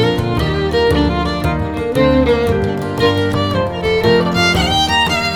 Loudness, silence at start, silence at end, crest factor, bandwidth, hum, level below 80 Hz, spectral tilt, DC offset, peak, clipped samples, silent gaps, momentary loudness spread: -15 LUFS; 0 s; 0 s; 14 dB; 18.5 kHz; none; -28 dBFS; -5.5 dB/octave; under 0.1%; -2 dBFS; under 0.1%; none; 5 LU